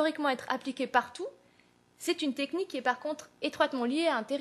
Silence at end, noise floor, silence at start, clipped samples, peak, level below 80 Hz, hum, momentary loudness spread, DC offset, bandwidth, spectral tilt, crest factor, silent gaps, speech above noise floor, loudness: 0 s; -65 dBFS; 0 s; under 0.1%; -10 dBFS; -80 dBFS; 60 Hz at -65 dBFS; 9 LU; under 0.1%; 13 kHz; -3 dB/octave; 22 dB; none; 33 dB; -32 LUFS